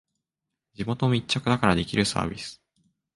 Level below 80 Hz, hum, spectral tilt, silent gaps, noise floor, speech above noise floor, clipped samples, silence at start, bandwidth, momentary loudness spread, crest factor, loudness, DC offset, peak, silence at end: -50 dBFS; none; -5 dB/octave; none; -86 dBFS; 61 dB; under 0.1%; 0.8 s; 11.5 kHz; 13 LU; 24 dB; -25 LUFS; under 0.1%; -4 dBFS; 0.6 s